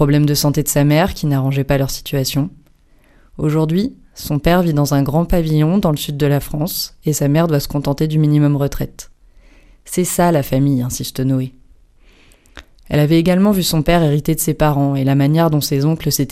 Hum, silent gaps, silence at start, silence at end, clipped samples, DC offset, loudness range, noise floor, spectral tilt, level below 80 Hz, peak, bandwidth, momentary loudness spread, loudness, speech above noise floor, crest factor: none; none; 0 s; 0 s; under 0.1%; under 0.1%; 4 LU; -50 dBFS; -6 dB/octave; -34 dBFS; -2 dBFS; 15.5 kHz; 7 LU; -16 LUFS; 35 dB; 14 dB